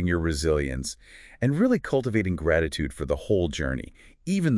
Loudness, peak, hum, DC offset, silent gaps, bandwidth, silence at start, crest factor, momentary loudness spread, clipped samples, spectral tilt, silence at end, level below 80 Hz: -26 LUFS; -10 dBFS; none; under 0.1%; none; 12 kHz; 0 s; 16 dB; 11 LU; under 0.1%; -6 dB/octave; 0 s; -40 dBFS